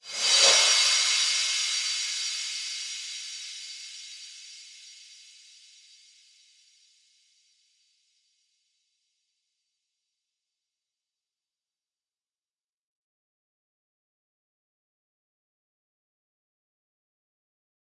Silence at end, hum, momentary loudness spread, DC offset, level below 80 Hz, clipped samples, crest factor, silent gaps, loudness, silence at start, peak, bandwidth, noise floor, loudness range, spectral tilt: 12.85 s; none; 26 LU; under 0.1%; under -90 dBFS; under 0.1%; 26 dB; none; -22 LUFS; 0.05 s; -8 dBFS; 11.5 kHz; under -90 dBFS; 25 LU; 4.5 dB/octave